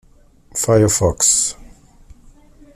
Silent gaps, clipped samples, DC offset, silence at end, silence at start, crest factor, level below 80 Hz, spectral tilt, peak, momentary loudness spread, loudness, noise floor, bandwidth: none; under 0.1%; under 0.1%; 1.1 s; 0.55 s; 18 dB; -40 dBFS; -4 dB/octave; -2 dBFS; 9 LU; -15 LUFS; -48 dBFS; 15.5 kHz